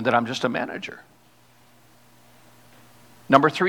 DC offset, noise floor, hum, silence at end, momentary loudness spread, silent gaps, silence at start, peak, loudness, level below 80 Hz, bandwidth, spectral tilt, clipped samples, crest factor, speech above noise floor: 0.1%; -57 dBFS; 60 Hz at -60 dBFS; 0 s; 18 LU; none; 0 s; 0 dBFS; -23 LUFS; -68 dBFS; 19.5 kHz; -5.5 dB/octave; under 0.1%; 24 dB; 35 dB